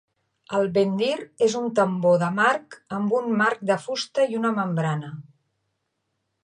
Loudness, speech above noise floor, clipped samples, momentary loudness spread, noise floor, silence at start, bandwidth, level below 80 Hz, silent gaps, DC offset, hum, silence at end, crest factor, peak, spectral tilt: -23 LUFS; 54 dB; under 0.1%; 8 LU; -77 dBFS; 0.5 s; 10.5 kHz; -72 dBFS; none; under 0.1%; none; 1.2 s; 16 dB; -8 dBFS; -5.5 dB/octave